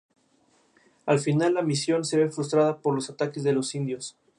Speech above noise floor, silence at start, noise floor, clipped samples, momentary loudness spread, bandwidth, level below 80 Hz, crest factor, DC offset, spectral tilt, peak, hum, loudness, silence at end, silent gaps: 40 dB; 1.05 s; -65 dBFS; under 0.1%; 8 LU; 11.5 kHz; -74 dBFS; 18 dB; under 0.1%; -5.5 dB/octave; -8 dBFS; none; -26 LUFS; 0.3 s; none